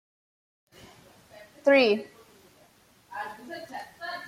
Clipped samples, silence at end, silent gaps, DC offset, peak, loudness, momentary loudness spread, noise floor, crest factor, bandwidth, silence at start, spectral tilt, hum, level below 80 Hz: under 0.1%; 0 s; none; under 0.1%; -8 dBFS; -26 LUFS; 21 LU; -60 dBFS; 22 dB; 15 kHz; 1.4 s; -4.5 dB/octave; none; -74 dBFS